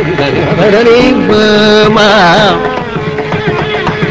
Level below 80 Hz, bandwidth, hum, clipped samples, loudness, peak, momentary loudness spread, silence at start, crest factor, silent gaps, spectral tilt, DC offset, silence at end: -32 dBFS; 8 kHz; none; 1%; -7 LUFS; 0 dBFS; 9 LU; 0 s; 8 dB; none; -5.5 dB/octave; under 0.1%; 0 s